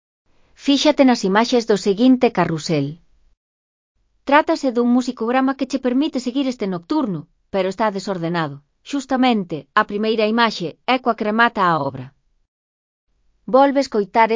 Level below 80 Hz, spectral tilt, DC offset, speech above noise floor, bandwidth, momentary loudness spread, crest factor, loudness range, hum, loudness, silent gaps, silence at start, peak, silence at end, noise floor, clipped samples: -58 dBFS; -5.5 dB/octave; under 0.1%; over 72 dB; 7.6 kHz; 11 LU; 20 dB; 4 LU; none; -18 LUFS; 3.37-3.95 s, 12.48-13.07 s; 0.6 s; 0 dBFS; 0 s; under -90 dBFS; under 0.1%